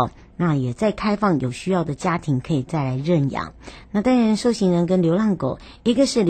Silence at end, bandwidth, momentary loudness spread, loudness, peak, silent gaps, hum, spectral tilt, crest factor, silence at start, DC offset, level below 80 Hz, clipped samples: 0 s; 9.2 kHz; 7 LU; -21 LUFS; -6 dBFS; none; none; -6.5 dB/octave; 14 dB; 0 s; under 0.1%; -48 dBFS; under 0.1%